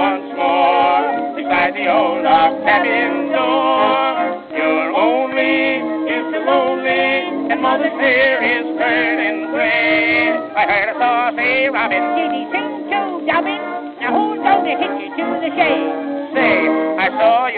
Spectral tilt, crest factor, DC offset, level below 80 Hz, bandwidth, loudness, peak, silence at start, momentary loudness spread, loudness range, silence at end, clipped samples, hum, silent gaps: -7.5 dB/octave; 16 dB; under 0.1%; -60 dBFS; 4.9 kHz; -16 LUFS; 0 dBFS; 0 s; 7 LU; 3 LU; 0 s; under 0.1%; none; none